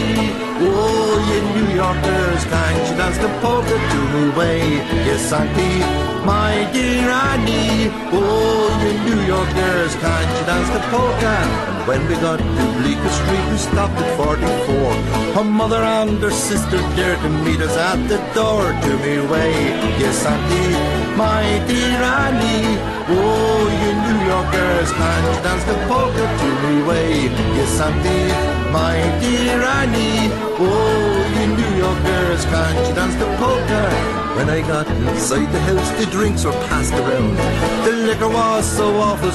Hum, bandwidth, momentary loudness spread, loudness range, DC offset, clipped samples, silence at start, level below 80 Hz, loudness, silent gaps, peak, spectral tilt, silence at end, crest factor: none; 13 kHz; 2 LU; 1 LU; under 0.1%; under 0.1%; 0 s; -28 dBFS; -17 LUFS; none; -4 dBFS; -5 dB/octave; 0 s; 12 dB